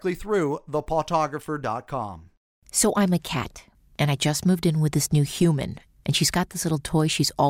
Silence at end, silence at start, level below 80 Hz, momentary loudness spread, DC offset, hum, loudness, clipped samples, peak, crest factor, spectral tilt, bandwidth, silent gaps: 0 s; 0.05 s; -48 dBFS; 9 LU; under 0.1%; none; -24 LUFS; under 0.1%; -10 dBFS; 14 dB; -4.5 dB/octave; 16.5 kHz; 2.37-2.62 s